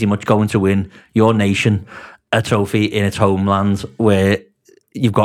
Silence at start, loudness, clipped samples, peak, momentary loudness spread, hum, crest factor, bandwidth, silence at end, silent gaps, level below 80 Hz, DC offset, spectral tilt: 0 s; -16 LUFS; under 0.1%; 0 dBFS; 8 LU; none; 16 dB; 14.5 kHz; 0 s; none; -48 dBFS; under 0.1%; -6.5 dB/octave